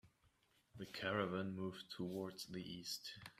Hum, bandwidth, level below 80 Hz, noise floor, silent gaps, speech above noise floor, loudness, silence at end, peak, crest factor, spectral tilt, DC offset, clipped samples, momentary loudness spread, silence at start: none; 15.5 kHz; -78 dBFS; -77 dBFS; none; 31 dB; -46 LUFS; 0.05 s; -26 dBFS; 22 dB; -4.5 dB/octave; under 0.1%; under 0.1%; 10 LU; 0.05 s